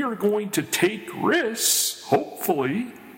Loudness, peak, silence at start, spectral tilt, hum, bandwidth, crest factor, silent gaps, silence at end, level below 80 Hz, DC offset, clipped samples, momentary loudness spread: -23 LUFS; -6 dBFS; 0 s; -3 dB/octave; none; 17 kHz; 18 dB; none; 0 s; -68 dBFS; under 0.1%; under 0.1%; 7 LU